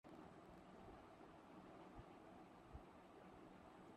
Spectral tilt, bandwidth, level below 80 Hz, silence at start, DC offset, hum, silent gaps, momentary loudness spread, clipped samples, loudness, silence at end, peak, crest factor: -6.5 dB/octave; 11.5 kHz; -74 dBFS; 0.05 s; under 0.1%; none; none; 2 LU; under 0.1%; -63 LUFS; 0 s; -44 dBFS; 18 dB